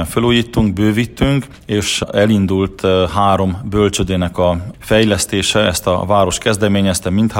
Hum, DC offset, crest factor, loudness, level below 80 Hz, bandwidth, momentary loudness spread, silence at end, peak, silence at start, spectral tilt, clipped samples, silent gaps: none; under 0.1%; 14 dB; -15 LUFS; -34 dBFS; 16.5 kHz; 4 LU; 0 s; 0 dBFS; 0 s; -5 dB/octave; under 0.1%; none